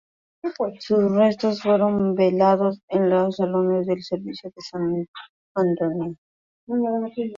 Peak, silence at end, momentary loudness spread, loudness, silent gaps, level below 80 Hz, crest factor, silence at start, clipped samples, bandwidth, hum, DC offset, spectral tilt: -6 dBFS; 0 s; 14 LU; -22 LUFS; 2.83-2.88 s, 5.08-5.14 s, 5.29-5.55 s, 6.18-6.67 s; -64 dBFS; 16 dB; 0.45 s; under 0.1%; 7.4 kHz; none; under 0.1%; -8 dB/octave